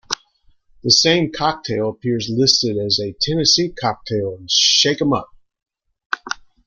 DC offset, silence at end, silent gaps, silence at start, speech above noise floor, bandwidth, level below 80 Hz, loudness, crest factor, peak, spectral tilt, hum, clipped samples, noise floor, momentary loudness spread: under 0.1%; 0.3 s; 6.06-6.10 s; 0.1 s; 38 dB; 12 kHz; -52 dBFS; -17 LUFS; 20 dB; 0 dBFS; -3 dB/octave; none; under 0.1%; -56 dBFS; 14 LU